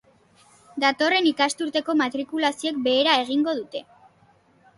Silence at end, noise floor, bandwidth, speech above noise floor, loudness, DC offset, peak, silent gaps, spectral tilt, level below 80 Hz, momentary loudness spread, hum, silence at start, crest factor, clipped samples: 0.95 s; -59 dBFS; 11.5 kHz; 36 dB; -22 LUFS; under 0.1%; -6 dBFS; none; -2 dB/octave; -72 dBFS; 10 LU; none; 0.75 s; 18 dB; under 0.1%